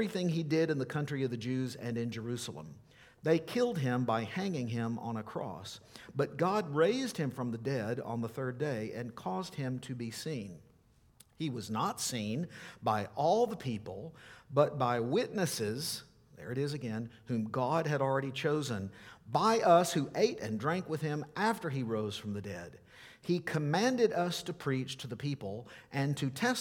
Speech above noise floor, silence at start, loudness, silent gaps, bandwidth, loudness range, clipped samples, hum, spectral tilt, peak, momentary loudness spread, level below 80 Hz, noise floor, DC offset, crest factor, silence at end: 32 dB; 0 s; -34 LUFS; none; 18.5 kHz; 7 LU; under 0.1%; none; -5.5 dB/octave; -12 dBFS; 12 LU; -70 dBFS; -65 dBFS; under 0.1%; 22 dB; 0 s